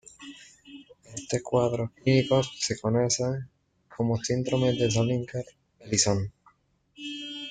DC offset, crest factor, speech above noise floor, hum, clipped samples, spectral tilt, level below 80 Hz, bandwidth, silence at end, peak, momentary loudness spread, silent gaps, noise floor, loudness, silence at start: under 0.1%; 18 dB; 39 dB; none; under 0.1%; -4.5 dB/octave; -58 dBFS; 9.6 kHz; 0 s; -10 dBFS; 21 LU; none; -65 dBFS; -27 LUFS; 0.2 s